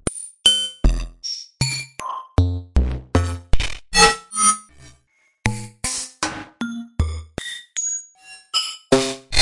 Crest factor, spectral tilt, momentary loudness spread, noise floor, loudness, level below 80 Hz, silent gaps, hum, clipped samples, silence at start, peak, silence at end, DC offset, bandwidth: 20 dB; -2.5 dB/octave; 14 LU; -62 dBFS; -21 LUFS; -28 dBFS; none; none; under 0.1%; 0.05 s; -2 dBFS; 0 s; under 0.1%; 11.5 kHz